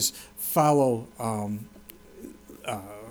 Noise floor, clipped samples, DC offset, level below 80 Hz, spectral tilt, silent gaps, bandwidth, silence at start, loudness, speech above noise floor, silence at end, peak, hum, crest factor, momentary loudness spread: -48 dBFS; under 0.1%; under 0.1%; -60 dBFS; -4.5 dB/octave; none; over 20 kHz; 0 s; -27 LUFS; 22 dB; 0 s; -10 dBFS; none; 18 dB; 24 LU